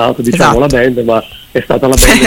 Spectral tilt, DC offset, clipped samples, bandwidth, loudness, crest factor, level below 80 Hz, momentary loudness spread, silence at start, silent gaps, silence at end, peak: -4 dB/octave; under 0.1%; 0.9%; over 20 kHz; -10 LUFS; 8 dB; -20 dBFS; 8 LU; 0 s; none; 0 s; 0 dBFS